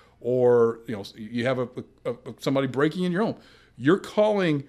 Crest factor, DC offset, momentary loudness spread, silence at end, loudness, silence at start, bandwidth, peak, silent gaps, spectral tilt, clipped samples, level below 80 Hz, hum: 18 dB; under 0.1%; 14 LU; 0.05 s; -25 LUFS; 0.25 s; 13.5 kHz; -8 dBFS; none; -7 dB/octave; under 0.1%; -64 dBFS; none